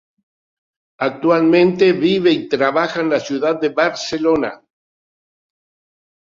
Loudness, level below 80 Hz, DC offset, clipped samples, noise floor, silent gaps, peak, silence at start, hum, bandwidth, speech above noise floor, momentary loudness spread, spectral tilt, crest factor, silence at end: -16 LUFS; -58 dBFS; under 0.1%; under 0.1%; under -90 dBFS; none; -2 dBFS; 1 s; none; 7.6 kHz; over 74 dB; 7 LU; -5.5 dB/octave; 16 dB; 1.75 s